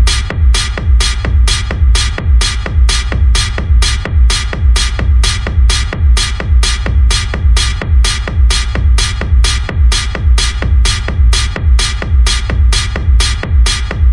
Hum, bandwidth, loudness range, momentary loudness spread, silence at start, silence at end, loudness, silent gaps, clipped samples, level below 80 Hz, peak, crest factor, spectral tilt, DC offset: none; 11.5 kHz; 0 LU; 1 LU; 0 s; 0 s; -12 LUFS; none; under 0.1%; -10 dBFS; 0 dBFS; 10 dB; -3.5 dB/octave; under 0.1%